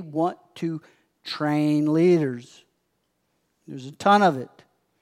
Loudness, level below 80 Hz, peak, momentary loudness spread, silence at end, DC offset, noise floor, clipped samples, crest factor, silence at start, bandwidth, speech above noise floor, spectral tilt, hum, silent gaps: -22 LUFS; -80 dBFS; -6 dBFS; 21 LU; 0.55 s; under 0.1%; -73 dBFS; under 0.1%; 20 dB; 0 s; 13 kHz; 51 dB; -7 dB/octave; none; none